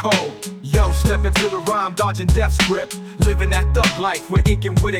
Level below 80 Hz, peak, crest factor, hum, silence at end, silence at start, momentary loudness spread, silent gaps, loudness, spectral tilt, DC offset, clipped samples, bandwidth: -22 dBFS; -4 dBFS; 14 dB; none; 0 s; 0 s; 5 LU; none; -18 LUFS; -5 dB/octave; under 0.1%; under 0.1%; 16 kHz